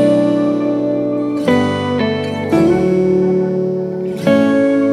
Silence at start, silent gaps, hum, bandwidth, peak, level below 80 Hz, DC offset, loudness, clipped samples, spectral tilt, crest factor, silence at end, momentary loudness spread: 0 s; none; none; 12 kHz; 0 dBFS; -46 dBFS; under 0.1%; -15 LUFS; under 0.1%; -7.5 dB/octave; 14 dB; 0 s; 6 LU